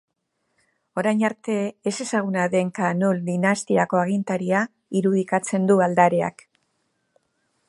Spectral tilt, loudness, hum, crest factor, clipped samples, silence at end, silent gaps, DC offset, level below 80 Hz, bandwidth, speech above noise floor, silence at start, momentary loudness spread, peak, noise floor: -6 dB/octave; -22 LUFS; none; 20 dB; under 0.1%; 1.4 s; none; under 0.1%; -70 dBFS; 11.5 kHz; 53 dB; 0.95 s; 7 LU; -2 dBFS; -75 dBFS